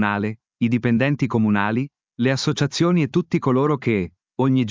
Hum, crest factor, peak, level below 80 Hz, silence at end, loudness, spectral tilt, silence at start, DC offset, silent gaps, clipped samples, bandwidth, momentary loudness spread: none; 16 dB; -4 dBFS; -52 dBFS; 0 s; -21 LUFS; -6.5 dB/octave; 0 s; under 0.1%; none; under 0.1%; 7.6 kHz; 6 LU